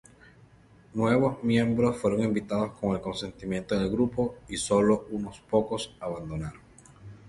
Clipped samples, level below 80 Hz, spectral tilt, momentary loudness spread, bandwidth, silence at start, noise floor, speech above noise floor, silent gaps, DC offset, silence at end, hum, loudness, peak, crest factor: under 0.1%; -52 dBFS; -6 dB/octave; 12 LU; 11.5 kHz; 0.95 s; -56 dBFS; 29 dB; none; under 0.1%; 0 s; none; -28 LUFS; -10 dBFS; 18 dB